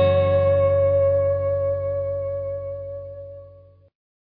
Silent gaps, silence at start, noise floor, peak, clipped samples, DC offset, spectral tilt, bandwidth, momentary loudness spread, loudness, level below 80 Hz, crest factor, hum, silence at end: none; 0 s; -49 dBFS; -8 dBFS; under 0.1%; under 0.1%; -10.5 dB/octave; 4.3 kHz; 18 LU; -21 LUFS; -48 dBFS; 14 dB; none; 0.85 s